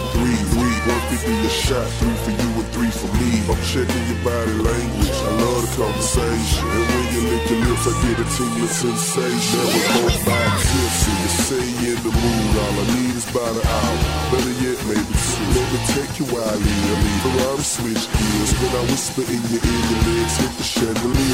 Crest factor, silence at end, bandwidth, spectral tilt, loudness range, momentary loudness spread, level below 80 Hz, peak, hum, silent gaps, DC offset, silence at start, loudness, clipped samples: 14 dB; 0 s; 16.5 kHz; -4.5 dB/octave; 2 LU; 4 LU; -28 dBFS; -4 dBFS; none; none; under 0.1%; 0 s; -19 LUFS; under 0.1%